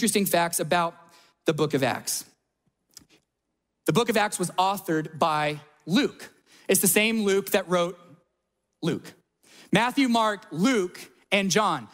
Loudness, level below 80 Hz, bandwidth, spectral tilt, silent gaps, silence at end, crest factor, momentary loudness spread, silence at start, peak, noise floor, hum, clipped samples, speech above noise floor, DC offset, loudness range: -25 LUFS; -66 dBFS; 16 kHz; -3.5 dB/octave; none; 0.05 s; 20 dB; 10 LU; 0 s; -6 dBFS; -80 dBFS; none; under 0.1%; 56 dB; under 0.1%; 4 LU